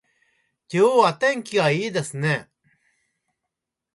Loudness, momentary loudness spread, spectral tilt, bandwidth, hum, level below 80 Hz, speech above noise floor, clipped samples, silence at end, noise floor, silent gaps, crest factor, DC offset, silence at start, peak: -21 LUFS; 10 LU; -5 dB/octave; 11.5 kHz; none; -68 dBFS; 63 dB; under 0.1%; 1.5 s; -83 dBFS; none; 20 dB; under 0.1%; 0.7 s; -4 dBFS